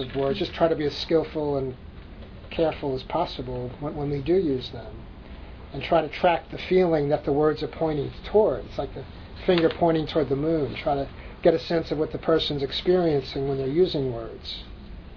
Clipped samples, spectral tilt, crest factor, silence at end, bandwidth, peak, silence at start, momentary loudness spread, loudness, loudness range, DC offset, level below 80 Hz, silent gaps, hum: under 0.1%; -7.5 dB/octave; 18 dB; 0 s; 5.4 kHz; -6 dBFS; 0 s; 17 LU; -25 LUFS; 4 LU; under 0.1%; -44 dBFS; none; none